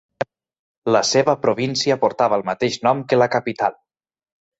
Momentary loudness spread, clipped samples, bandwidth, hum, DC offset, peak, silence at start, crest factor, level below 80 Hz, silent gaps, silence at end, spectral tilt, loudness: 10 LU; under 0.1%; 8.2 kHz; none; under 0.1%; -2 dBFS; 0.2 s; 18 dB; -62 dBFS; 0.59-0.82 s; 0.85 s; -4 dB/octave; -19 LUFS